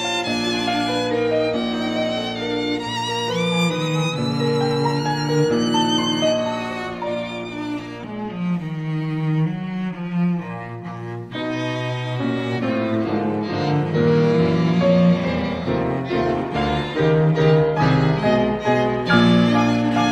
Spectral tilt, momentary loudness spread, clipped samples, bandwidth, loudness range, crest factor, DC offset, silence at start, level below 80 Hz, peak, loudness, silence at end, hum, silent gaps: -6 dB/octave; 10 LU; under 0.1%; 11 kHz; 7 LU; 16 dB; under 0.1%; 0 s; -46 dBFS; -4 dBFS; -20 LUFS; 0 s; none; none